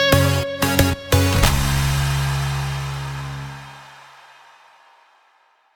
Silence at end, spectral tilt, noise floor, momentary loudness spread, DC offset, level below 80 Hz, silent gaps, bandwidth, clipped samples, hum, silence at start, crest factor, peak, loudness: 1.8 s; -4.5 dB/octave; -59 dBFS; 16 LU; under 0.1%; -30 dBFS; none; 19 kHz; under 0.1%; none; 0 s; 20 dB; -2 dBFS; -20 LUFS